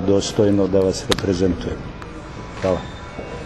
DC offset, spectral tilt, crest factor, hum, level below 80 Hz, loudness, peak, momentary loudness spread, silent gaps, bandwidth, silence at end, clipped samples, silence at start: under 0.1%; -5.5 dB/octave; 20 dB; none; -38 dBFS; -20 LUFS; 0 dBFS; 16 LU; none; 12.5 kHz; 0 s; under 0.1%; 0 s